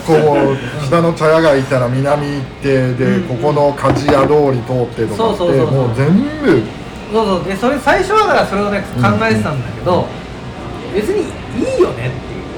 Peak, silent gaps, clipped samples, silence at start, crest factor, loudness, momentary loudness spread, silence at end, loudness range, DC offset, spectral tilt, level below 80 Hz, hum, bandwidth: -4 dBFS; none; under 0.1%; 0 s; 10 dB; -14 LUFS; 10 LU; 0 s; 3 LU; under 0.1%; -7 dB/octave; -36 dBFS; none; 18.5 kHz